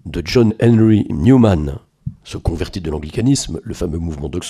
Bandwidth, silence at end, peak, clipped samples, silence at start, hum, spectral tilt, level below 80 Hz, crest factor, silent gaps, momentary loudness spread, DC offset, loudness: 13.5 kHz; 0 s; 0 dBFS; under 0.1%; 0.05 s; none; -6.5 dB/octave; -32 dBFS; 16 dB; none; 15 LU; under 0.1%; -16 LUFS